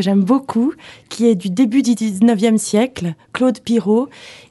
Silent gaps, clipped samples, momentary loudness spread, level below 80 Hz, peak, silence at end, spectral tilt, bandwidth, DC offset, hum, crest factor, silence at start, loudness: none; under 0.1%; 10 LU; -58 dBFS; -2 dBFS; 0.15 s; -6 dB/octave; 12 kHz; under 0.1%; none; 14 dB; 0 s; -16 LUFS